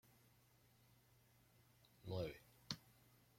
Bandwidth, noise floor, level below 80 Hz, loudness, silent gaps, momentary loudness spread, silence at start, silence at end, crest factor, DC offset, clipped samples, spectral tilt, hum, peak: 16.5 kHz; -74 dBFS; -78 dBFS; -51 LUFS; none; 13 LU; 1.85 s; 0.25 s; 30 dB; under 0.1%; under 0.1%; -5 dB/octave; none; -26 dBFS